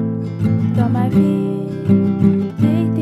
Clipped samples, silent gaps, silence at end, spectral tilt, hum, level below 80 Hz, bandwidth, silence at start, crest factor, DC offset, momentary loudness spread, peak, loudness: under 0.1%; none; 0 s; -10 dB/octave; none; -50 dBFS; 7.8 kHz; 0 s; 14 dB; under 0.1%; 6 LU; -2 dBFS; -17 LUFS